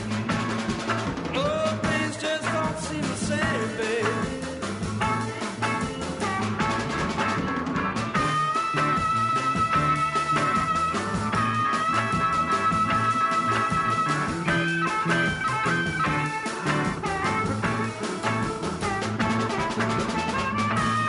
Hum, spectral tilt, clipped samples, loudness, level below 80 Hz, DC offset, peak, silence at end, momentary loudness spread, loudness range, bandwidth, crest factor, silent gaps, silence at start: none; -5 dB/octave; under 0.1%; -25 LUFS; -48 dBFS; under 0.1%; -12 dBFS; 0 s; 5 LU; 4 LU; 11 kHz; 14 dB; none; 0 s